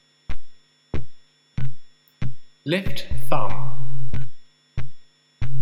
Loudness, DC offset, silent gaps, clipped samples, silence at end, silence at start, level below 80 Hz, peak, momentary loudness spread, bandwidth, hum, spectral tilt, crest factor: -31 LUFS; under 0.1%; none; under 0.1%; 0 s; 0 s; -40 dBFS; -4 dBFS; 15 LU; 15.5 kHz; none; -6.5 dB/octave; 10 dB